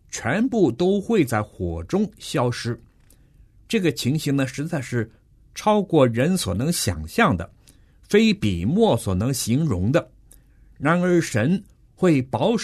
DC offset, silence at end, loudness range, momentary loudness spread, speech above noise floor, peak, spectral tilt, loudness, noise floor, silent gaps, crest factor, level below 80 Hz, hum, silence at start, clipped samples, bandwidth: under 0.1%; 0 s; 4 LU; 9 LU; 33 dB; -4 dBFS; -5.5 dB/octave; -22 LUFS; -54 dBFS; none; 18 dB; -46 dBFS; none; 0.1 s; under 0.1%; 13.5 kHz